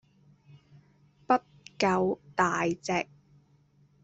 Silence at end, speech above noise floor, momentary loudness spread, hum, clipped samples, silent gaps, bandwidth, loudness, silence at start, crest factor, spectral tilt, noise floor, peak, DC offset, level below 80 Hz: 1 s; 36 dB; 5 LU; none; under 0.1%; none; 8.2 kHz; -29 LUFS; 1.3 s; 22 dB; -5 dB/octave; -64 dBFS; -10 dBFS; under 0.1%; -66 dBFS